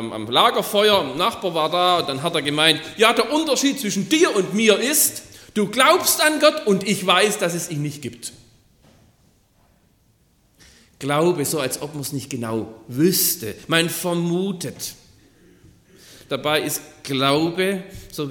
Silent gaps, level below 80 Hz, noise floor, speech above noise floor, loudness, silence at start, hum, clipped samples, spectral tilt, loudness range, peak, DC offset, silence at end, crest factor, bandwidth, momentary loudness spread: none; -58 dBFS; -60 dBFS; 40 dB; -19 LUFS; 0 s; none; under 0.1%; -3 dB/octave; 9 LU; 0 dBFS; under 0.1%; 0 s; 20 dB; 17.5 kHz; 13 LU